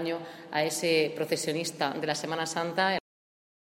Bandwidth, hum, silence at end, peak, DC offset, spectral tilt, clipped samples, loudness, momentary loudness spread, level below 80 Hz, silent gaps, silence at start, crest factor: 16 kHz; none; 0.75 s; -12 dBFS; under 0.1%; -3.5 dB/octave; under 0.1%; -29 LUFS; 8 LU; -76 dBFS; none; 0 s; 20 dB